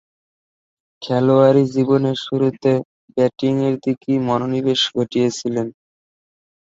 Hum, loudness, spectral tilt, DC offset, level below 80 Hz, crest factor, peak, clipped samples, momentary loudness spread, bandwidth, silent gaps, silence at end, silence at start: none; -18 LUFS; -6.5 dB/octave; under 0.1%; -60 dBFS; 18 dB; -2 dBFS; under 0.1%; 9 LU; 8 kHz; 2.85-3.08 s; 0.95 s; 1 s